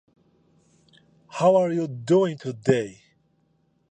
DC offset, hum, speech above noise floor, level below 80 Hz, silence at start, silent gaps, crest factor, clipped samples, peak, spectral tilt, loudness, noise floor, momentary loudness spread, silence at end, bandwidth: under 0.1%; none; 45 dB; -66 dBFS; 1.35 s; none; 22 dB; under 0.1%; -4 dBFS; -7 dB/octave; -23 LUFS; -67 dBFS; 11 LU; 1 s; 9.4 kHz